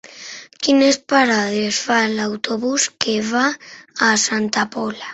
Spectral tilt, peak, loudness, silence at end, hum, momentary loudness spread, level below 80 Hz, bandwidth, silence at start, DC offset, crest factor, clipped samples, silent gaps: -2.5 dB/octave; -2 dBFS; -18 LUFS; 0 s; none; 13 LU; -62 dBFS; 8.2 kHz; 0.05 s; under 0.1%; 16 dB; under 0.1%; none